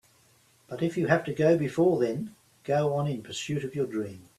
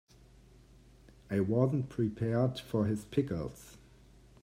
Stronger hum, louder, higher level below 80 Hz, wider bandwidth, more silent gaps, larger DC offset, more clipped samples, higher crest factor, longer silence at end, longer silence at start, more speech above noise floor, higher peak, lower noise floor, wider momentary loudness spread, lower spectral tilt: neither; first, -28 LUFS vs -33 LUFS; second, -66 dBFS vs -60 dBFS; second, 13.5 kHz vs 15.5 kHz; neither; neither; neither; about the same, 20 dB vs 20 dB; second, 0.2 s vs 0.65 s; second, 0.7 s vs 1.3 s; first, 35 dB vs 27 dB; first, -8 dBFS vs -14 dBFS; first, -63 dBFS vs -59 dBFS; about the same, 12 LU vs 11 LU; second, -6.5 dB/octave vs -8 dB/octave